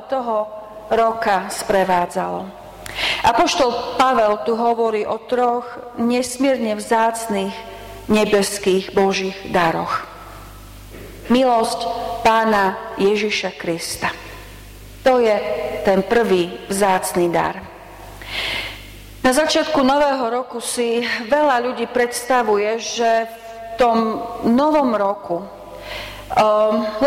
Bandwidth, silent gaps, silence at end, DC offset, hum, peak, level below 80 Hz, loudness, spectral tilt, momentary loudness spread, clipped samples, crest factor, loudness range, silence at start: 16.5 kHz; none; 0 s; under 0.1%; none; -4 dBFS; -46 dBFS; -18 LUFS; -4 dB/octave; 18 LU; under 0.1%; 14 dB; 2 LU; 0 s